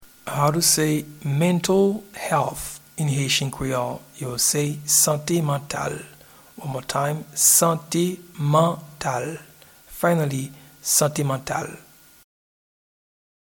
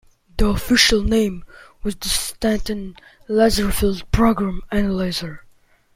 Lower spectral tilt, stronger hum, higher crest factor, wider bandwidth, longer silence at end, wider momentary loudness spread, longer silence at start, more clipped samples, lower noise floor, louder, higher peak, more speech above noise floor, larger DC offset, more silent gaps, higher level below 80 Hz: about the same, -3.5 dB/octave vs -4 dB/octave; neither; about the same, 20 dB vs 20 dB; first, 19 kHz vs 16.5 kHz; first, 1.75 s vs 0.55 s; about the same, 14 LU vs 15 LU; second, 0 s vs 0.35 s; neither; second, -45 dBFS vs -54 dBFS; about the same, -21 LUFS vs -19 LUFS; about the same, -2 dBFS vs 0 dBFS; second, 23 dB vs 35 dB; neither; neither; second, -54 dBFS vs -30 dBFS